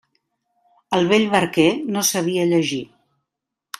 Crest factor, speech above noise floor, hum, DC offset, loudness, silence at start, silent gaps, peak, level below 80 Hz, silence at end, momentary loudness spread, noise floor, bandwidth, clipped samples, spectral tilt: 18 dB; 65 dB; none; under 0.1%; -19 LUFS; 0.9 s; none; -2 dBFS; -62 dBFS; 0.95 s; 7 LU; -83 dBFS; 15.5 kHz; under 0.1%; -4 dB/octave